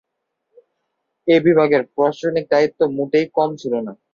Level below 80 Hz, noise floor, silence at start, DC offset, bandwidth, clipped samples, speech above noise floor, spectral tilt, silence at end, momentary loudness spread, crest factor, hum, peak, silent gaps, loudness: -64 dBFS; -75 dBFS; 1.25 s; under 0.1%; 7.2 kHz; under 0.1%; 58 dB; -7 dB/octave; 0.2 s; 10 LU; 16 dB; none; -2 dBFS; none; -18 LUFS